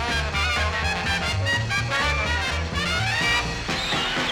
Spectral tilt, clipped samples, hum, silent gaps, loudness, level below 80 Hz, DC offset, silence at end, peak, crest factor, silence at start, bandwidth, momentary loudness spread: -3.5 dB/octave; under 0.1%; none; none; -23 LUFS; -34 dBFS; under 0.1%; 0 s; -10 dBFS; 14 dB; 0 s; 17.5 kHz; 3 LU